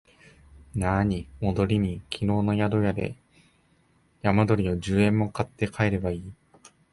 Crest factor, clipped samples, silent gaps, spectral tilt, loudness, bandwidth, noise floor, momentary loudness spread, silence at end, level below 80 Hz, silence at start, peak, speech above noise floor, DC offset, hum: 20 dB; under 0.1%; none; -7.5 dB/octave; -26 LUFS; 11.5 kHz; -64 dBFS; 9 LU; 0.6 s; -44 dBFS; 0.75 s; -6 dBFS; 39 dB; under 0.1%; none